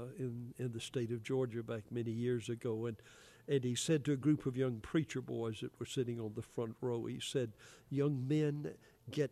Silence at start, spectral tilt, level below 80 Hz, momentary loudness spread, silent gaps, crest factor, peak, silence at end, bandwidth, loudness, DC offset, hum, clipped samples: 0 s; -6 dB/octave; -70 dBFS; 10 LU; none; 16 dB; -22 dBFS; 0.05 s; 14 kHz; -39 LUFS; under 0.1%; none; under 0.1%